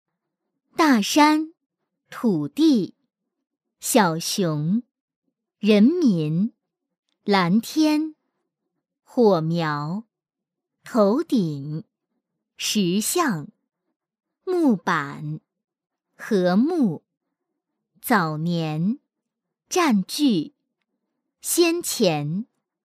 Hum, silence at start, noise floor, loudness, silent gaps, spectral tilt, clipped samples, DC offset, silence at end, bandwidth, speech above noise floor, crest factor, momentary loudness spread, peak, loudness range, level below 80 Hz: none; 0.8 s; -87 dBFS; -22 LUFS; 1.66-1.70 s, 5.00-5.08 s, 5.16-5.22 s, 6.99-7.03 s, 13.96-14.00 s; -5 dB/octave; under 0.1%; under 0.1%; 0.55 s; 15.5 kHz; 66 dB; 20 dB; 15 LU; -2 dBFS; 4 LU; -74 dBFS